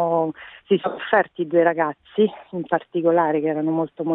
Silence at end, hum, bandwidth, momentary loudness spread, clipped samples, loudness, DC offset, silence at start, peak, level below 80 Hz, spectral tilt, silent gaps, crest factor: 0 s; none; 4 kHz; 6 LU; under 0.1%; -21 LUFS; under 0.1%; 0 s; -6 dBFS; -68 dBFS; -10.5 dB/octave; none; 16 dB